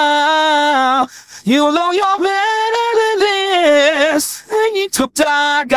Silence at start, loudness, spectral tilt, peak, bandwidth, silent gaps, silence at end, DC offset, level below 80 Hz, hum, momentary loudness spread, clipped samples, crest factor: 0 s; -14 LUFS; -2 dB/octave; -2 dBFS; 16 kHz; none; 0 s; 0.2%; -54 dBFS; none; 6 LU; under 0.1%; 12 dB